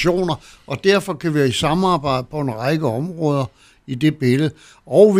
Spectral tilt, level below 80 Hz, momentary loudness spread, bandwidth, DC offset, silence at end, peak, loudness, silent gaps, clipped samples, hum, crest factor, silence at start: -6 dB/octave; -48 dBFS; 7 LU; 15.5 kHz; under 0.1%; 0 s; 0 dBFS; -19 LUFS; none; under 0.1%; none; 18 dB; 0 s